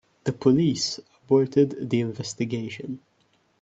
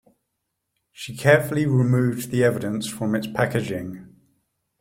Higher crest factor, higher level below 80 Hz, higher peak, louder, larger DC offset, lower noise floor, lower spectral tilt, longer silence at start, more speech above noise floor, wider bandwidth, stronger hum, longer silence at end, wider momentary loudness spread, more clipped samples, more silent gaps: about the same, 18 dB vs 20 dB; second, -64 dBFS vs -58 dBFS; about the same, -6 dBFS vs -4 dBFS; about the same, -24 LUFS vs -22 LUFS; neither; second, -66 dBFS vs -78 dBFS; about the same, -6 dB/octave vs -6.5 dB/octave; second, 0.25 s vs 1 s; second, 42 dB vs 57 dB; second, 8.2 kHz vs 16.5 kHz; neither; about the same, 0.65 s vs 0.7 s; about the same, 15 LU vs 17 LU; neither; neither